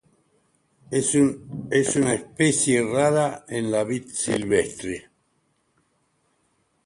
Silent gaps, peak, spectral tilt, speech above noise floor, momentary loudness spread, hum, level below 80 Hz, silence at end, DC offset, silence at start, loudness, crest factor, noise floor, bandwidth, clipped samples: none; -6 dBFS; -4.5 dB/octave; 46 dB; 9 LU; none; -58 dBFS; 1.85 s; under 0.1%; 0.9 s; -23 LUFS; 18 dB; -69 dBFS; 11.5 kHz; under 0.1%